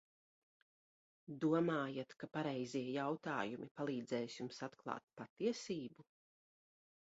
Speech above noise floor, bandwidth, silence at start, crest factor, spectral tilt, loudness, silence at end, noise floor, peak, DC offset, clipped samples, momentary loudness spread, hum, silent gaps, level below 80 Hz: over 48 dB; 7.6 kHz; 1.3 s; 20 dB; -5 dB/octave; -42 LUFS; 1.1 s; under -90 dBFS; -24 dBFS; under 0.1%; under 0.1%; 11 LU; none; 3.71-3.75 s, 5.30-5.36 s; -86 dBFS